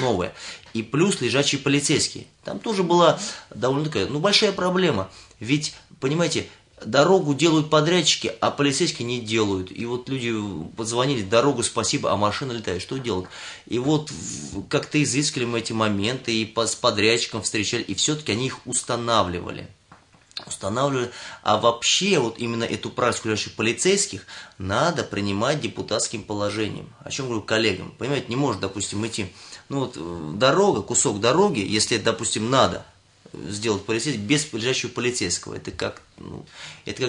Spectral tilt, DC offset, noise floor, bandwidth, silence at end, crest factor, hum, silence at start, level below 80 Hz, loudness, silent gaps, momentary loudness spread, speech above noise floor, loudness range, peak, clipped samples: -3.5 dB/octave; under 0.1%; -53 dBFS; 11 kHz; 0 s; 20 dB; none; 0 s; -60 dBFS; -23 LUFS; none; 13 LU; 30 dB; 5 LU; -4 dBFS; under 0.1%